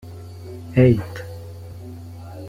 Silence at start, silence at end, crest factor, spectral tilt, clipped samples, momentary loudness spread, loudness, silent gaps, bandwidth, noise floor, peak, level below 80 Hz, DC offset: 0.05 s; 0 s; 20 dB; -9 dB/octave; under 0.1%; 21 LU; -18 LUFS; none; 14.5 kHz; -36 dBFS; -2 dBFS; -46 dBFS; under 0.1%